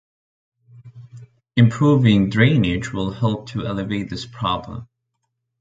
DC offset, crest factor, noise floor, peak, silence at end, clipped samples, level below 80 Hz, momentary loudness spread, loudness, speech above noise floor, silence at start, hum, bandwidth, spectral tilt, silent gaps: under 0.1%; 20 dB; -75 dBFS; -2 dBFS; 0.75 s; under 0.1%; -44 dBFS; 11 LU; -19 LUFS; 57 dB; 0.75 s; none; 7.8 kHz; -7.5 dB/octave; none